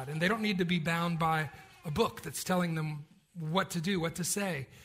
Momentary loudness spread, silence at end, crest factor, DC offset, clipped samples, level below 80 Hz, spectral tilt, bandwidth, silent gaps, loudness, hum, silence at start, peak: 10 LU; 0 s; 18 dB; under 0.1%; under 0.1%; -62 dBFS; -4.5 dB/octave; 16 kHz; none; -32 LUFS; none; 0 s; -14 dBFS